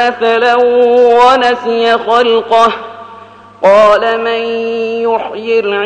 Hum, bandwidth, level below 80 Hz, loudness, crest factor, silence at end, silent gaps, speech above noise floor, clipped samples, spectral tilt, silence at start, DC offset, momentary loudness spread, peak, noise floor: none; 9.2 kHz; -52 dBFS; -10 LUFS; 10 dB; 0 s; none; 25 dB; under 0.1%; -4 dB/octave; 0 s; under 0.1%; 9 LU; 0 dBFS; -34 dBFS